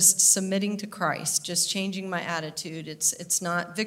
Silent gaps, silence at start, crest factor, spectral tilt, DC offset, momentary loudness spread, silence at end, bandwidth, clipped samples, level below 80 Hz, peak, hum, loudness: none; 0 s; 22 dB; -2 dB/octave; under 0.1%; 12 LU; 0 s; 16 kHz; under 0.1%; -74 dBFS; -6 dBFS; none; -25 LUFS